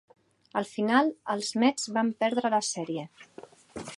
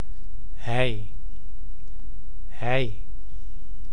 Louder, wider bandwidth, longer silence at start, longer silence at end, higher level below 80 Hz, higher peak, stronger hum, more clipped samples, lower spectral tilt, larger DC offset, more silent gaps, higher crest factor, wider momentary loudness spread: about the same, -28 LUFS vs -29 LUFS; about the same, 11.5 kHz vs 11 kHz; first, 0.55 s vs 0 s; about the same, 0 s vs 0 s; second, -72 dBFS vs -38 dBFS; about the same, -8 dBFS vs -8 dBFS; neither; neither; second, -3.5 dB/octave vs -6.5 dB/octave; second, under 0.1% vs 10%; neither; about the same, 22 dB vs 22 dB; second, 12 LU vs 19 LU